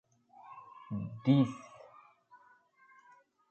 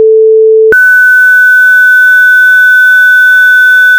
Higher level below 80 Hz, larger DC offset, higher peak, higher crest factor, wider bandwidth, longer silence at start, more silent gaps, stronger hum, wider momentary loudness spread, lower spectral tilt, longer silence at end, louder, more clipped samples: second, -72 dBFS vs -50 dBFS; neither; second, -14 dBFS vs 0 dBFS; first, 22 dB vs 4 dB; second, 8.4 kHz vs over 20 kHz; first, 0.5 s vs 0 s; neither; second, none vs 60 Hz at -75 dBFS; first, 25 LU vs 2 LU; first, -8.5 dB/octave vs -0.5 dB/octave; first, 1.9 s vs 0 s; second, -32 LUFS vs -2 LUFS; second, under 0.1% vs 9%